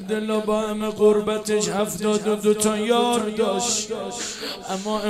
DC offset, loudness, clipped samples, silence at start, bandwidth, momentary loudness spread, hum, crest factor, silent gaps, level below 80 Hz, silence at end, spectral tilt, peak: under 0.1%; -22 LUFS; under 0.1%; 0 s; 15 kHz; 9 LU; none; 16 dB; none; -54 dBFS; 0 s; -3.5 dB/octave; -6 dBFS